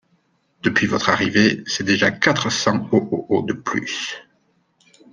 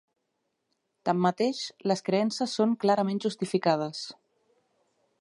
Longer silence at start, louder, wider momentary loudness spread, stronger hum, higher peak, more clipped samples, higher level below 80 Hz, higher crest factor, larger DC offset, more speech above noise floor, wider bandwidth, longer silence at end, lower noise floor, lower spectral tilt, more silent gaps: second, 0.65 s vs 1.05 s; first, -19 LUFS vs -28 LUFS; about the same, 9 LU vs 9 LU; neither; first, -2 dBFS vs -10 dBFS; neither; first, -58 dBFS vs -78 dBFS; about the same, 20 dB vs 20 dB; neither; second, 44 dB vs 52 dB; second, 10 kHz vs 11.5 kHz; second, 0.9 s vs 1.1 s; second, -64 dBFS vs -79 dBFS; second, -4 dB/octave vs -5.5 dB/octave; neither